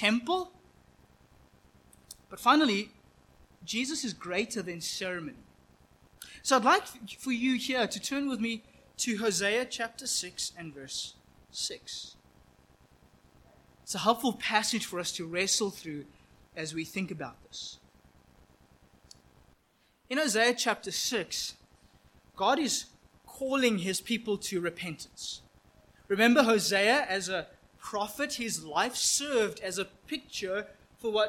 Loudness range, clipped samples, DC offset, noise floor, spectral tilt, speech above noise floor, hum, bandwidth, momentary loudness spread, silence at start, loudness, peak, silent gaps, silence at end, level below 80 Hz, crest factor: 9 LU; under 0.1%; under 0.1%; -69 dBFS; -2.5 dB/octave; 39 dB; none; 17 kHz; 17 LU; 0 s; -30 LUFS; -10 dBFS; none; 0 s; -66 dBFS; 24 dB